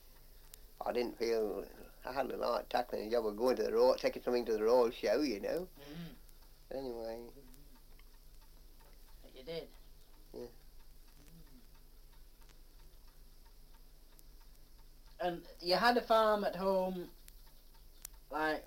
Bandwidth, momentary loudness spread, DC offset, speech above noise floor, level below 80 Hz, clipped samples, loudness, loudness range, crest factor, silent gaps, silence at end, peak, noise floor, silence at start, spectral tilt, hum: 17 kHz; 23 LU; under 0.1%; 22 dB; -58 dBFS; under 0.1%; -35 LUFS; 19 LU; 22 dB; none; 0 s; -16 dBFS; -57 dBFS; 0.05 s; -4.5 dB/octave; none